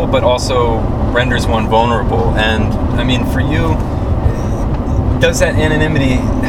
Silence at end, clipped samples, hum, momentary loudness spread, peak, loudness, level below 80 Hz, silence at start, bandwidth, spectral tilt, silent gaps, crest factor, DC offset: 0 s; under 0.1%; none; 4 LU; 0 dBFS; -14 LUFS; -20 dBFS; 0 s; 16 kHz; -6 dB/octave; none; 12 dB; under 0.1%